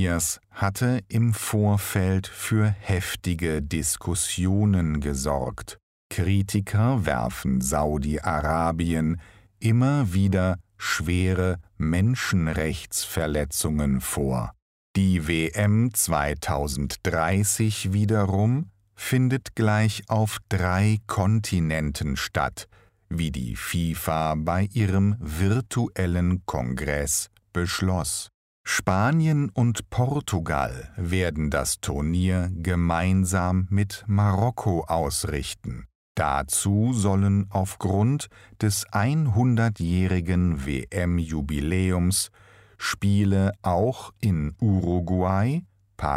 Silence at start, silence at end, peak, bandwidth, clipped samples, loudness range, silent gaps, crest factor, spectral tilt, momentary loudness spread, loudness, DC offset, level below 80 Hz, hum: 0 s; 0 s; -6 dBFS; 16 kHz; under 0.1%; 2 LU; 5.83-6.10 s, 14.62-14.94 s, 28.34-28.64 s, 35.95-36.15 s; 18 dB; -5.5 dB/octave; 7 LU; -25 LUFS; under 0.1%; -40 dBFS; none